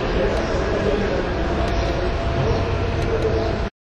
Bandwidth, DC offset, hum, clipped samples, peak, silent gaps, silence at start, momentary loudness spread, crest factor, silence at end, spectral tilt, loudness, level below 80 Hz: 9.2 kHz; under 0.1%; none; under 0.1%; -8 dBFS; none; 0 s; 2 LU; 14 dB; 0.15 s; -6.5 dB/octave; -22 LUFS; -26 dBFS